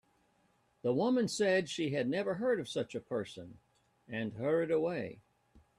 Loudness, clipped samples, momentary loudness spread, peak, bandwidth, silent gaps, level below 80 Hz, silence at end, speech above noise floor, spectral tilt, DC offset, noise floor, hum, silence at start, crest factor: -34 LUFS; under 0.1%; 12 LU; -18 dBFS; 13.5 kHz; none; -74 dBFS; 0.2 s; 39 dB; -5.5 dB/octave; under 0.1%; -73 dBFS; none; 0.85 s; 16 dB